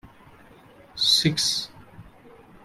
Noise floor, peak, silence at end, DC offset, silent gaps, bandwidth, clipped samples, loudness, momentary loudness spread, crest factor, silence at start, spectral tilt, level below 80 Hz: -51 dBFS; -8 dBFS; 0.55 s; under 0.1%; none; 16 kHz; under 0.1%; -21 LUFS; 20 LU; 20 dB; 0.05 s; -2.5 dB/octave; -58 dBFS